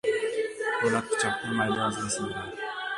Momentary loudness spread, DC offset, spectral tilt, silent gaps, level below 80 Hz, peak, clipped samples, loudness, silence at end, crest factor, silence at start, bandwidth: 8 LU; under 0.1%; -3.5 dB/octave; none; -60 dBFS; -12 dBFS; under 0.1%; -28 LUFS; 0 s; 16 dB; 0.05 s; 11.5 kHz